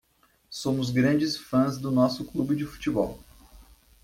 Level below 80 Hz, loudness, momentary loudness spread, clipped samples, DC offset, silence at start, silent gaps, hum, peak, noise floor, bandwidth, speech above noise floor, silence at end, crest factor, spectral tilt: -54 dBFS; -26 LUFS; 9 LU; under 0.1%; under 0.1%; 0.5 s; none; none; -10 dBFS; -64 dBFS; 16 kHz; 39 dB; 0.4 s; 18 dB; -6 dB/octave